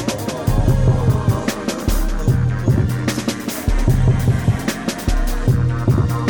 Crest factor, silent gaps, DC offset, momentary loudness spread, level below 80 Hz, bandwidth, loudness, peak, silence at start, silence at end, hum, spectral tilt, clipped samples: 12 dB; none; under 0.1%; 6 LU; -22 dBFS; over 20 kHz; -19 LUFS; -4 dBFS; 0 s; 0 s; none; -6.5 dB/octave; under 0.1%